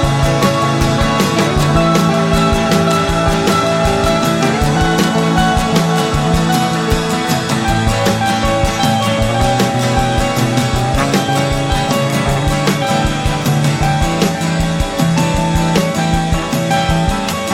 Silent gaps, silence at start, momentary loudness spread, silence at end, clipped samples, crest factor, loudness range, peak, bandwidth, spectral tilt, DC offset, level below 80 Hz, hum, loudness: none; 0 s; 3 LU; 0 s; under 0.1%; 14 dB; 2 LU; 0 dBFS; 16.5 kHz; -5 dB/octave; under 0.1%; -24 dBFS; none; -14 LUFS